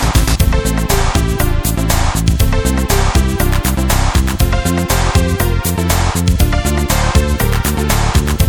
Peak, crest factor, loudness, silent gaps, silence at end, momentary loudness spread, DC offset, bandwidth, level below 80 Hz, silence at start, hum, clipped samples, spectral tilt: 0 dBFS; 12 dB; -14 LUFS; none; 0 s; 2 LU; under 0.1%; 19.5 kHz; -16 dBFS; 0 s; none; under 0.1%; -4.5 dB/octave